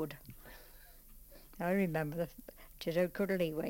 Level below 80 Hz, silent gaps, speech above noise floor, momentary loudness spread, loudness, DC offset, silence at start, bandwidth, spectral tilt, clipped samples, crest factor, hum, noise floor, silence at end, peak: -58 dBFS; none; 22 dB; 23 LU; -36 LUFS; under 0.1%; 0 s; 17 kHz; -6.5 dB/octave; under 0.1%; 18 dB; none; -57 dBFS; 0 s; -20 dBFS